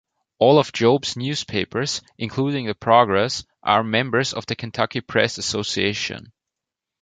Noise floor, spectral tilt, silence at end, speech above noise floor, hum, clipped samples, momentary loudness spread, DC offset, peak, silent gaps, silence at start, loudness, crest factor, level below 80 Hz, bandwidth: -85 dBFS; -4.5 dB/octave; 0.85 s; 65 dB; none; under 0.1%; 11 LU; under 0.1%; -2 dBFS; none; 0.4 s; -21 LUFS; 20 dB; -54 dBFS; 9.4 kHz